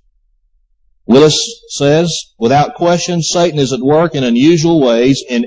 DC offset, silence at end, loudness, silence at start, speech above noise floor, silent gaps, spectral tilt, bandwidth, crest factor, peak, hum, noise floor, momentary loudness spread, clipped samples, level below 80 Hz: under 0.1%; 0 s; -11 LUFS; 1.1 s; 46 dB; none; -5 dB/octave; 8 kHz; 12 dB; 0 dBFS; none; -56 dBFS; 6 LU; under 0.1%; -48 dBFS